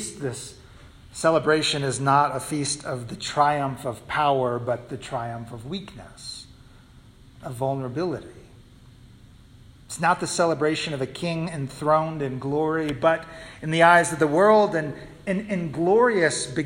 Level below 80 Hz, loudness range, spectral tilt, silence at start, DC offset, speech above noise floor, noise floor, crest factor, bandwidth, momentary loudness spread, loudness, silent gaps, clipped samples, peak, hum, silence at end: -54 dBFS; 13 LU; -4.5 dB/octave; 0 s; under 0.1%; 27 dB; -50 dBFS; 20 dB; 16 kHz; 17 LU; -23 LUFS; none; under 0.1%; -4 dBFS; none; 0 s